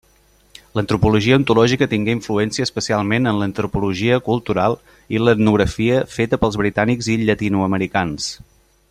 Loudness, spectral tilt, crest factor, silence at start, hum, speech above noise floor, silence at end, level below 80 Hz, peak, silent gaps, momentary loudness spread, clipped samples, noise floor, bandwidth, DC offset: -18 LUFS; -6 dB/octave; 18 dB; 0.75 s; none; 37 dB; 0.55 s; -42 dBFS; 0 dBFS; none; 7 LU; under 0.1%; -55 dBFS; 13.5 kHz; under 0.1%